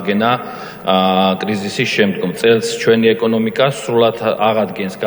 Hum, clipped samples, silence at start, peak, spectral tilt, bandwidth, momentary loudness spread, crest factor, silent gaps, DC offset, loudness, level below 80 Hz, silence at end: none; under 0.1%; 0 s; 0 dBFS; -5 dB/octave; over 20 kHz; 6 LU; 14 dB; none; under 0.1%; -15 LUFS; -58 dBFS; 0 s